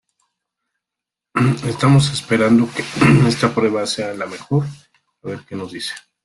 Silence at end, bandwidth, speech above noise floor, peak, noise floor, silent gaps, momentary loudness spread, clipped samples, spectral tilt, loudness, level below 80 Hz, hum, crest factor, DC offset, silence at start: 0.25 s; 12 kHz; 68 dB; -2 dBFS; -85 dBFS; none; 16 LU; under 0.1%; -6 dB/octave; -17 LUFS; -50 dBFS; none; 18 dB; under 0.1%; 1.35 s